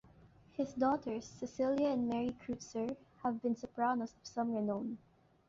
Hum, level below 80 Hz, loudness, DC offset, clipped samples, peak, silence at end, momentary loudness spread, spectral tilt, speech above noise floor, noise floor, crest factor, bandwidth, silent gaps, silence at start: none; -70 dBFS; -38 LUFS; under 0.1%; under 0.1%; -22 dBFS; 0.5 s; 10 LU; -5.5 dB/octave; 26 dB; -63 dBFS; 16 dB; 7.6 kHz; none; 0.6 s